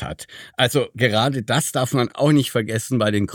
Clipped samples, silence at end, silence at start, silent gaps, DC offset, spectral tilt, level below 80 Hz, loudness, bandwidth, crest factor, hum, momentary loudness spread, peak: under 0.1%; 0 s; 0 s; none; under 0.1%; -5 dB/octave; -52 dBFS; -20 LUFS; 19 kHz; 18 dB; none; 6 LU; -2 dBFS